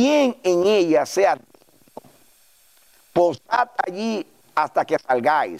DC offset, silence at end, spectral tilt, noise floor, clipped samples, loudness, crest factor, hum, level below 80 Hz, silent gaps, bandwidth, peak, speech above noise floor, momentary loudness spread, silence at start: under 0.1%; 0 s; -4.5 dB/octave; -56 dBFS; under 0.1%; -21 LUFS; 14 dB; none; -70 dBFS; none; 15.5 kHz; -6 dBFS; 37 dB; 9 LU; 0 s